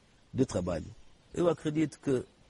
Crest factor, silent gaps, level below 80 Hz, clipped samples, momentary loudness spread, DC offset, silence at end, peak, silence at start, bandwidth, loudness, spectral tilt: 18 dB; none; -56 dBFS; under 0.1%; 11 LU; under 0.1%; 0.25 s; -14 dBFS; 0.35 s; 11.5 kHz; -32 LUFS; -7 dB/octave